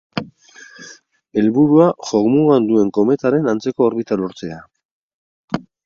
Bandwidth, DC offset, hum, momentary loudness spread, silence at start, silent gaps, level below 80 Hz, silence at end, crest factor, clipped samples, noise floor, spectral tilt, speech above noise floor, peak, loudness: 7.4 kHz; under 0.1%; none; 17 LU; 0.15 s; 4.85-5.48 s; -58 dBFS; 0.25 s; 16 dB; under 0.1%; -43 dBFS; -7.5 dB/octave; 29 dB; 0 dBFS; -16 LUFS